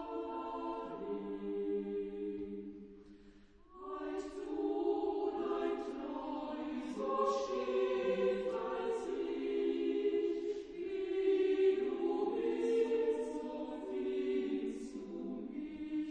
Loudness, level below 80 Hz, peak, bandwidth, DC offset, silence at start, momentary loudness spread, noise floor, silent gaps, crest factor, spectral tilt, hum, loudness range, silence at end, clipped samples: -37 LUFS; -66 dBFS; -22 dBFS; 9.4 kHz; under 0.1%; 0 s; 10 LU; -60 dBFS; none; 16 dB; -6 dB/octave; none; 8 LU; 0 s; under 0.1%